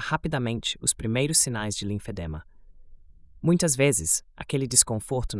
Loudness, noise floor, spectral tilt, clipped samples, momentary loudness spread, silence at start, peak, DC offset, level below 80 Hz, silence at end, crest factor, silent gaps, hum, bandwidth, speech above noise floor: -24 LUFS; -49 dBFS; -3.5 dB/octave; under 0.1%; 13 LU; 0 s; -4 dBFS; under 0.1%; -44 dBFS; 0 s; 24 dB; none; none; 12 kHz; 23 dB